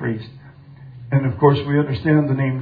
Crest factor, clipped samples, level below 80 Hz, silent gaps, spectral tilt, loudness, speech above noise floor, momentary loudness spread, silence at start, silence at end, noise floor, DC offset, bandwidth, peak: 18 dB; under 0.1%; -50 dBFS; none; -11 dB/octave; -18 LUFS; 23 dB; 16 LU; 0 s; 0 s; -41 dBFS; under 0.1%; 4.9 kHz; 0 dBFS